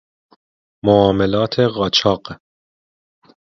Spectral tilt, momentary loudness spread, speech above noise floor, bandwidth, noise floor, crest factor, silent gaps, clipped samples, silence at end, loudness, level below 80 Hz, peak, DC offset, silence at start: -6 dB/octave; 10 LU; over 74 dB; 7.4 kHz; under -90 dBFS; 18 dB; none; under 0.1%; 1.05 s; -16 LUFS; -46 dBFS; 0 dBFS; under 0.1%; 0.85 s